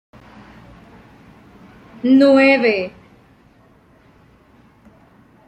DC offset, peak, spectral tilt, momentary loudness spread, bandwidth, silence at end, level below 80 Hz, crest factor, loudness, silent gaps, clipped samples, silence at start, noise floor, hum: under 0.1%; -2 dBFS; -6 dB/octave; 13 LU; 8.6 kHz; 2.6 s; -58 dBFS; 18 dB; -14 LUFS; none; under 0.1%; 2.05 s; -51 dBFS; none